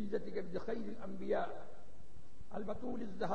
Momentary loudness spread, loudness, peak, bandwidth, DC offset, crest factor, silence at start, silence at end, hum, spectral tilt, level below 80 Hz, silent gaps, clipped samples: 23 LU; -43 LUFS; -24 dBFS; 9.6 kHz; 1%; 18 dB; 0 s; 0 s; none; -7.5 dB/octave; -64 dBFS; none; under 0.1%